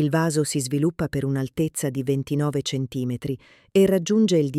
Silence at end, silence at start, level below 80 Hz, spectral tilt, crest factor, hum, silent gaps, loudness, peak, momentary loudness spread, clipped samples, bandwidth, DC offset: 0 s; 0 s; -54 dBFS; -6 dB/octave; 14 dB; none; none; -23 LUFS; -8 dBFS; 9 LU; under 0.1%; 15.5 kHz; under 0.1%